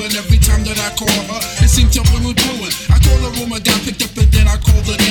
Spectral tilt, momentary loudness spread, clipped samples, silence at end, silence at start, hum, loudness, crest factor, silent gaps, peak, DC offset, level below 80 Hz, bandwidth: -4 dB/octave; 6 LU; under 0.1%; 0 s; 0 s; none; -14 LUFS; 12 dB; none; 0 dBFS; under 0.1%; -14 dBFS; 19 kHz